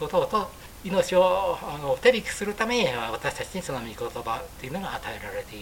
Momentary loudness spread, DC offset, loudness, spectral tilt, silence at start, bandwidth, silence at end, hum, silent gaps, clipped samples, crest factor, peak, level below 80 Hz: 12 LU; under 0.1%; -27 LUFS; -4 dB/octave; 0 s; 17 kHz; 0 s; none; none; under 0.1%; 22 dB; -4 dBFS; -48 dBFS